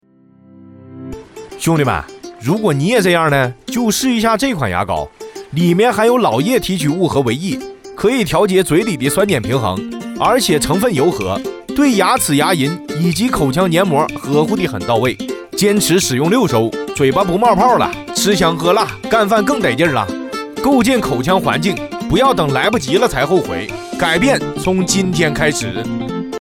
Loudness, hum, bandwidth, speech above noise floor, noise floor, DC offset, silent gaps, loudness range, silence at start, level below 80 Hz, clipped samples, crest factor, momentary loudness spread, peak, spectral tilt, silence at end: -15 LUFS; none; 18 kHz; 33 dB; -47 dBFS; under 0.1%; none; 2 LU; 0.6 s; -40 dBFS; under 0.1%; 14 dB; 10 LU; 0 dBFS; -4.5 dB/octave; 0 s